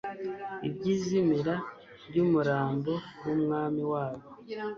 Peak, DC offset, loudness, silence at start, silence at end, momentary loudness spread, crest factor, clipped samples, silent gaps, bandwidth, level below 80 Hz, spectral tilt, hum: -16 dBFS; under 0.1%; -30 LUFS; 0.05 s; 0 s; 11 LU; 16 dB; under 0.1%; none; 7.2 kHz; -66 dBFS; -7.5 dB/octave; none